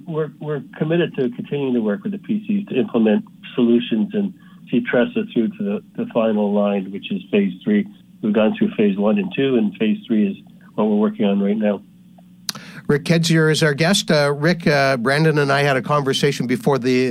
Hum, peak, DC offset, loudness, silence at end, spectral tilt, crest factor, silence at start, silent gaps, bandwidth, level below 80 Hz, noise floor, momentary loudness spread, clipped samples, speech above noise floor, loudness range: none; -6 dBFS; under 0.1%; -19 LUFS; 0 s; -6 dB/octave; 12 dB; 0.05 s; none; 14 kHz; -58 dBFS; -46 dBFS; 10 LU; under 0.1%; 28 dB; 4 LU